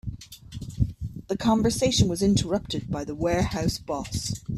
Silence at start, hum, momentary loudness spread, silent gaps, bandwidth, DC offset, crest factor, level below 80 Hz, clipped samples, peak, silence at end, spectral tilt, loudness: 0.05 s; none; 16 LU; none; 14.5 kHz; under 0.1%; 18 dB; -40 dBFS; under 0.1%; -8 dBFS; 0 s; -5.5 dB/octave; -26 LUFS